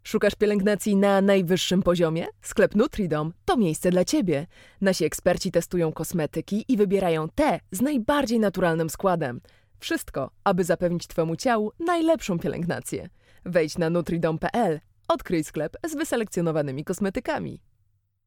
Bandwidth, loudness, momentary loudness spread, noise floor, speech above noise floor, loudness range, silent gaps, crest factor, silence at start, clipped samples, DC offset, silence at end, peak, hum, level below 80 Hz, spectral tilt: 18 kHz; -25 LUFS; 8 LU; -68 dBFS; 44 dB; 4 LU; none; 18 dB; 0.05 s; under 0.1%; under 0.1%; 0.7 s; -6 dBFS; none; -50 dBFS; -5.5 dB/octave